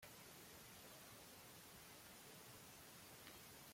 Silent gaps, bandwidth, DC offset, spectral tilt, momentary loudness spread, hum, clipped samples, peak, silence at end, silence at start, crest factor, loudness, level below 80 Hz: none; 16.5 kHz; under 0.1%; -2.5 dB/octave; 1 LU; none; under 0.1%; -44 dBFS; 0 s; 0 s; 18 dB; -59 LUFS; -80 dBFS